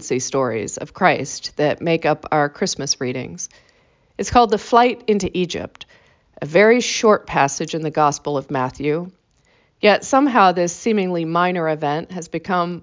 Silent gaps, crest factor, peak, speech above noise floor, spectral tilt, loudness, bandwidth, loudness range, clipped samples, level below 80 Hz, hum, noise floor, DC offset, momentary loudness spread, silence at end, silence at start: none; 18 dB; -2 dBFS; 40 dB; -4.5 dB/octave; -18 LUFS; 7.8 kHz; 3 LU; under 0.1%; -50 dBFS; none; -59 dBFS; under 0.1%; 13 LU; 0 s; 0 s